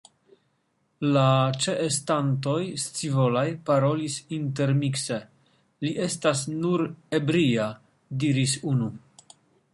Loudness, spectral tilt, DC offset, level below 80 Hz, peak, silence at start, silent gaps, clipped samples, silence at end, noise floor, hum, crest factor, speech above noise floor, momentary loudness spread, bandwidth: -25 LUFS; -5.5 dB/octave; under 0.1%; -66 dBFS; -8 dBFS; 1 s; none; under 0.1%; 0.75 s; -71 dBFS; none; 18 dB; 47 dB; 8 LU; 11.5 kHz